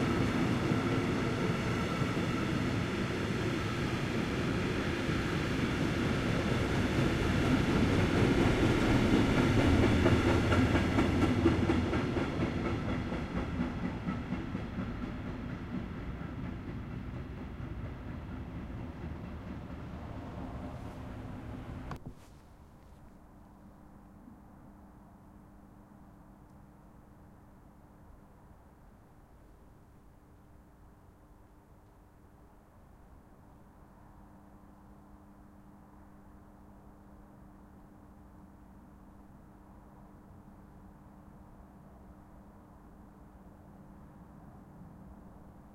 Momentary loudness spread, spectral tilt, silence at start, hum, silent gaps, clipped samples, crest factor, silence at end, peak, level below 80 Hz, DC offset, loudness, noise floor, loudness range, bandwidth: 27 LU; -6.5 dB/octave; 0 s; none; none; under 0.1%; 20 dB; 0 s; -14 dBFS; -46 dBFS; under 0.1%; -32 LUFS; -58 dBFS; 27 LU; 15 kHz